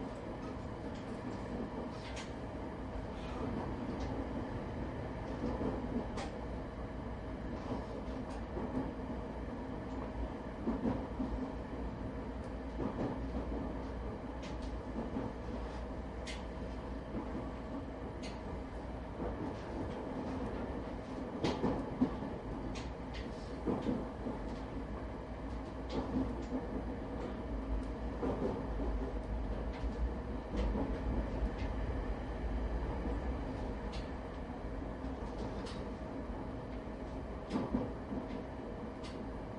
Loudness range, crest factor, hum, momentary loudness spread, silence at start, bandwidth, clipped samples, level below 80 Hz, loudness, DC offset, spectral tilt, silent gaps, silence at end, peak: 4 LU; 20 dB; none; 6 LU; 0 s; 11 kHz; under 0.1%; -44 dBFS; -41 LUFS; under 0.1%; -7.5 dB/octave; none; 0 s; -20 dBFS